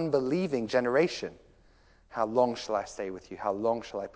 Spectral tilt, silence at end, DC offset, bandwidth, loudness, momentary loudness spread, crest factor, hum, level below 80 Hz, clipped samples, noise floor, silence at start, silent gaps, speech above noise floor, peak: -5.5 dB/octave; 0.05 s; under 0.1%; 8 kHz; -30 LUFS; 11 LU; 20 dB; none; -62 dBFS; under 0.1%; -61 dBFS; 0 s; none; 31 dB; -12 dBFS